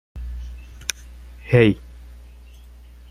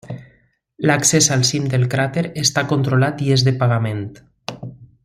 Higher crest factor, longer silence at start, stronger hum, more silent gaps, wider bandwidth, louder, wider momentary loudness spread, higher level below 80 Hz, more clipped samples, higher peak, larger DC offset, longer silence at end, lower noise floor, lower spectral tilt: first, 24 dB vs 18 dB; about the same, 0.15 s vs 0.05 s; first, 60 Hz at -35 dBFS vs none; neither; about the same, 16 kHz vs 15 kHz; second, -20 LUFS vs -17 LUFS; first, 27 LU vs 20 LU; first, -38 dBFS vs -54 dBFS; neither; about the same, -2 dBFS vs -2 dBFS; neither; first, 0.8 s vs 0.2 s; second, -43 dBFS vs -58 dBFS; first, -6 dB/octave vs -4 dB/octave